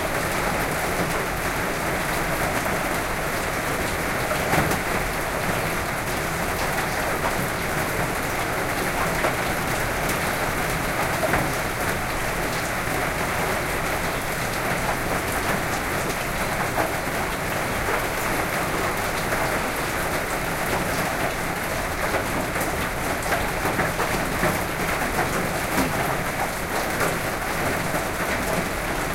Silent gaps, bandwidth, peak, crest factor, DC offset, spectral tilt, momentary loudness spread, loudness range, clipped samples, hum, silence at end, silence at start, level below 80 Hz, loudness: none; 17 kHz; -8 dBFS; 16 dB; under 0.1%; -4 dB/octave; 2 LU; 1 LU; under 0.1%; none; 0 s; 0 s; -36 dBFS; -24 LUFS